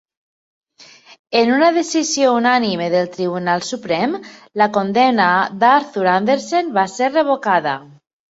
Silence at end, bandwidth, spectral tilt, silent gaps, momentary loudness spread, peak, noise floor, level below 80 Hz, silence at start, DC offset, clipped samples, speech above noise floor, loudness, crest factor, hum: 0.45 s; 8 kHz; -4 dB/octave; 1.19-1.25 s; 8 LU; -2 dBFS; -45 dBFS; -64 dBFS; 0.8 s; under 0.1%; under 0.1%; 29 dB; -16 LUFS; 16 dB; none